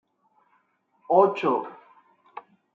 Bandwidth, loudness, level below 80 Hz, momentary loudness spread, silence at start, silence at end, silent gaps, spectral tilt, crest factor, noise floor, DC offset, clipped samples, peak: 6.6 kHz; -23 LUFS; -82 dBFS; 25 LU; 1.1 s; 0.35 s; none; -7.5 dB/octave; 22 dB; -68 dBFS; under 0.1%; under 0.1%; -4 dBFS